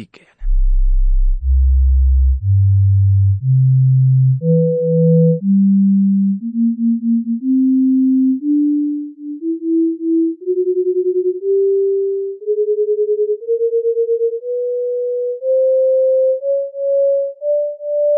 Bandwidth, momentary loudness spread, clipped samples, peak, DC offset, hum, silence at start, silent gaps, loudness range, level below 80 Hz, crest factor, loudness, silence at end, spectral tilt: 0.7 kHz; 8 LU; under 0.1%; -4 dBFS; under 0.1%; none; 0 s; none; 4 LU; -22 dBFS; 10 dB; -16 LUFS; 0 s; -15.5 dB/octave